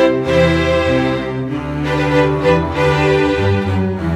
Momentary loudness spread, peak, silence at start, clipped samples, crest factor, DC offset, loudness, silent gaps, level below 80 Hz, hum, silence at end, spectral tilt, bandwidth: 7 LU; -2 dBFS; 0 s; under 0.1%; 14 dB; under 0.1%; -15 LUFS; none; -32 dBFS; none; 0 s; -7 dB/octave; 12.5 kHz